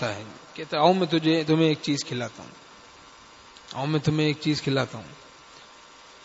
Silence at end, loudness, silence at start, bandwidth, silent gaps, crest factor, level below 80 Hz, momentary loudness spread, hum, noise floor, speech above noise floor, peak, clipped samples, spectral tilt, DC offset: 0.65 s; -24 LUFS; 0 s; 8 kHz; none; 20 dB; -62 dBFS; 20 LU; none; -49 dBFS; 25 dB; -6 dBFS; under 0.1%; -5.5 dB/octave; under 0.1%